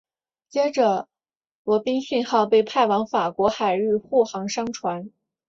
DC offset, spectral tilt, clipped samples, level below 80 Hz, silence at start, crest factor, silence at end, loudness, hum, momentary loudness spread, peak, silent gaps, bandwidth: under 0.1%; -4.5 dB/octave; under 0.1%; -64 dBFS; 0.55 s; 18 dB; 0.4 s; -22 LUFS; none; 10 LU; -6 dBFS; 1.37-1.41 s, 1.51-1.65 s; 7.8 kHz